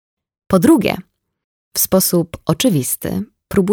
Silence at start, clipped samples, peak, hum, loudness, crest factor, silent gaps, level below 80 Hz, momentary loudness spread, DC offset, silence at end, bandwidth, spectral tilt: 0.5 s; under 0.1%; 0 dBFS; none; -16 LUFS; 16 dB; 1.44-1.71 s; -44 dBFS; 11 LU; under 0.1%; 0 s; over 20 kHz; -5 dB/octave